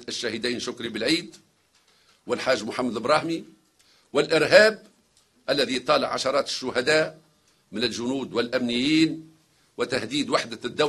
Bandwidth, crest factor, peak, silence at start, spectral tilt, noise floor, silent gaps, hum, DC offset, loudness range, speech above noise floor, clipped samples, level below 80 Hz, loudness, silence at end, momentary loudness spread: 13 kHz; 26 dB; 0 dBFS; 0 s; -3.5 dB/octave; -63 dBFS; none; none; under 0.1%; 5 LU; 39 dB; under 0.1%; -64 dBFS; -24 LUFS; 0 s; 11 LU